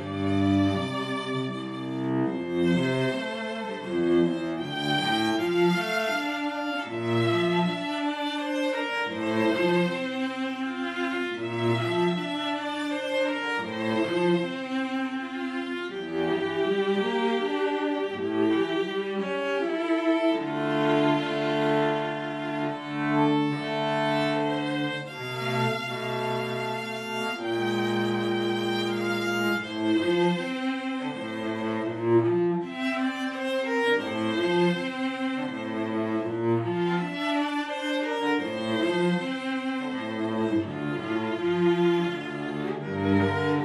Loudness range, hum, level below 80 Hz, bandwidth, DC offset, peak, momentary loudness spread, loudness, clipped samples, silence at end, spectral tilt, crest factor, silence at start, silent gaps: 2 LU; none; -68 dBFS; 13.5 kHz; under 0.1%; -10 dBFS; 7 LU; -27 LUFS; under 0.1%; 0 s; -6 dB/octave; 16 dB; 0 s; none